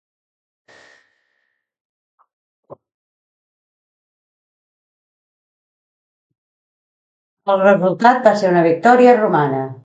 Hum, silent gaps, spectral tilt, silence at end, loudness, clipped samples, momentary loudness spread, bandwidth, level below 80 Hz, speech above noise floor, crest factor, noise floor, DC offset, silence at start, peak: none; 2.94-6.30 s, 6.38-7.37 s; -7 dB/octave; 0.1 s; -13 LUFS; under 0.1%; 9 LU; 8 kHz; -70 dBFS; 57 dB; 18 dB; -70 dBFS; under 0.1%; 2.7 s; 0 dBFS